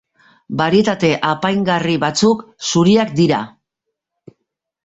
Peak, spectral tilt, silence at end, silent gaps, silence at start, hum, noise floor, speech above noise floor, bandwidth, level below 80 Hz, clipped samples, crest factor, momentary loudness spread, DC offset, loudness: -2 dBFS; -5 dB/octave; 1.35 s; none; 0.5 s; none; -78 dBFS; 63 dB; 8 kHz; -54 dBFS; under 0.1%; 14 dB; 7 LU; under 0.1%; -16 LUFS